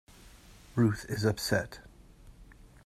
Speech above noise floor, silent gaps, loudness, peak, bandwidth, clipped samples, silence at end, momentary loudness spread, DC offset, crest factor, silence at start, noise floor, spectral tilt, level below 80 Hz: 25 dB; none; -31 LUFS; -12 dBFS; 14.5 kHz; under 0.1%; 0.3 s; 13 LU; under 0.1%; 22 dB; 0.25 s; -54 dBFS; -5.5 dB/octave; -54 dBFS